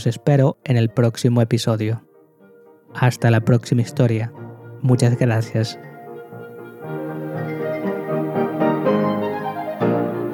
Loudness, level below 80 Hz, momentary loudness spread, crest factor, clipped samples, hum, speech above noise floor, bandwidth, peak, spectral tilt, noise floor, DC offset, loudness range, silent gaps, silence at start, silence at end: -20 LUFS; -62 dBFS; 19 LU; 16 dB; under 0.1%; none; 32 dB; 16.5 kHz; -4 dBFS; -7 dB/octave; -50 dBFS; under 0.1%; 5 LU; none; 0 s; 0 s